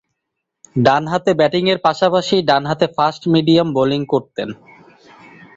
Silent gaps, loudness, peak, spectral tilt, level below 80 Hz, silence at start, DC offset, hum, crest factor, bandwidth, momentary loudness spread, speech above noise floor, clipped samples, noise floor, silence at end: none; -16 LUFS; -2 dBFS; -6 dB/octave; -56 dBFS; 0.75 s; under 0.1%; none; 16 dB; 7.8 kHz; 6 LU; 62 dB; under 0.1%; -77 dBFS; 1.05 s